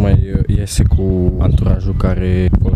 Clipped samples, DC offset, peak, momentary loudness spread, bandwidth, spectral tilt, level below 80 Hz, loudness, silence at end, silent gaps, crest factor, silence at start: under 0.1%; under 0.1%; 0 dBFS; 3 LU; 13 kHz; -7.5 dB/octave; -16 dBFS; -15 LUFS; 0 s; none; 12 dB; 0 s